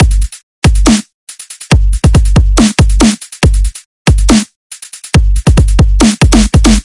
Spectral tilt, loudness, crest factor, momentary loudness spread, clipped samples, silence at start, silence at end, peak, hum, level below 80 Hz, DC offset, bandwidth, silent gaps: -5 dB/octave; -10 LUFS; 8 dB; 17 LU; 0.8%; 0 s; 0.05 s; 0 dBFS; none; -12 dBFS; under 0.1%; 11.5 kHz; 0.43-0.62 s, 1.14-1.27 s, 3.85-4.05 s, 4.56-4.70 s